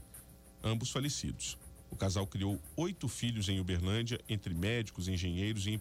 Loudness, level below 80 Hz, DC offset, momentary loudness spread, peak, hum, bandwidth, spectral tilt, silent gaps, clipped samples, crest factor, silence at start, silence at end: -36 LUFS; -54 dBFS; under 0.1%; 7 LU; -24 dBFS; none; 16 kHz; -5 dB/octave; none; under 0.1%; 12 dB; 0 s; 0 s